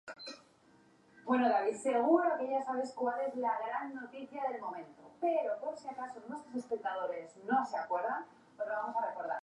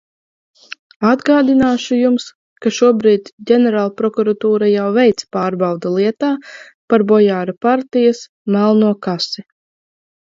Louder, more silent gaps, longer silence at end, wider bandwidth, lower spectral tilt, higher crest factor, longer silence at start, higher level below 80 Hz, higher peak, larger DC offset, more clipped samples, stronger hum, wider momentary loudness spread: second, -35 LUFS vs -15 LUFS; second, none vs 2.35-2.56 s, 3.33-3.38 s, 6.74-6.88 s, 8.29-8.45 s; second, 0 s vs 0.85 s; first, 11 kHz vs 7.6 kHz; second, -4.5 dB/octave vs -6 dB/octave; first, 22 dB vs 14 dB; second, 0.05 s vs 1 s; second, -88 dBFS vs -56 dBFS; second, -14 dBFS vs 0 dBFS; neither; neither; neither; first, 16 LU vs 9 LU